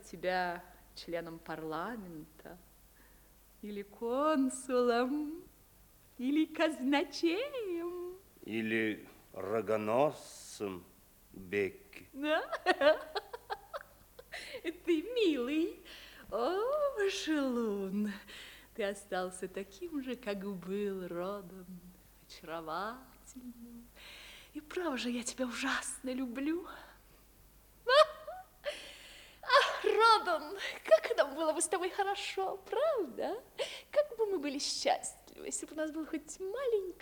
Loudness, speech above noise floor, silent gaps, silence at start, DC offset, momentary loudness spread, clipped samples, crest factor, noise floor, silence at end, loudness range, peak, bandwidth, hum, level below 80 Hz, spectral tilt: -34 LUFS; 27 dB; none; 0 s; under 0.1%; 21 LU; under 0.1%; 24 dB; -62 dBFS; 0.05 s; 11 LU; -12 dBFS; over 20 kHz; none; -66 dBFS; -3.5 dB/octave